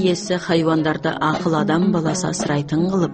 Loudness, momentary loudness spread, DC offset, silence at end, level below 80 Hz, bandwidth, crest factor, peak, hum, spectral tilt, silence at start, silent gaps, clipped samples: -19 LUFS; 4 LU; under 0.1%; 0 s; -50 dBFS; 8.8 kHz; 12 dB; -6 dBFS; none; -5.5 dB/octave; 0 s; none; under 0.1%